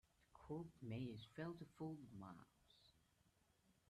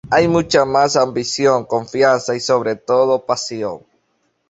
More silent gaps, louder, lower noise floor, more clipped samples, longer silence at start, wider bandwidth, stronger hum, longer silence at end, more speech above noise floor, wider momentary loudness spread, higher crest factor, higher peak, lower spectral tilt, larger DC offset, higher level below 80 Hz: neither; second, -54 LUFS vs -16 LUFS; first, -80 dBFS vs -66 dBFS; neither; first, 0.3 s vs 0.05 s; first, 13 kHz vs 8 kHz; neither; second, 0.2 s vs 0.7 s; second, 27 dB vs 50 dB; about the same, 9 LU vs 8 LU; about the same, 16 dB vs 16 dB; second, -40 dBFS vs -2 dBFS; first, -7.5 dB/octave vs -4 dB/octave; neither; second, -78 dBFS vs -52 dBFS